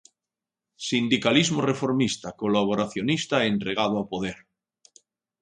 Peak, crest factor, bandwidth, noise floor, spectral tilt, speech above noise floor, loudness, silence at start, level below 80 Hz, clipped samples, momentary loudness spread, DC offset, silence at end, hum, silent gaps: -6 dBFS; 20 dB; 10.5 kHz; -89 dBFS; -4.5 dB/octave; 65 dB; -24 LUFS; 0.8 s; -60 dBFS; under 0.1%; 10 LU; under 0.1%; 1.05 s; none; none